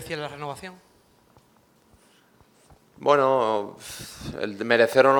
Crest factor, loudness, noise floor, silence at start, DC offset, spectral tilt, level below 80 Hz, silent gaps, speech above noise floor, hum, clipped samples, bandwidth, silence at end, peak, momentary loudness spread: 22 dB; -24 LUFS; -60 dBFS; 0 s; under 0.1%; -4.5 dB/octave; -58 dBFS; none; 37 dB; none; under 0.1%; 19.5 kHz; 0 s; -2 dBFS; 18 LU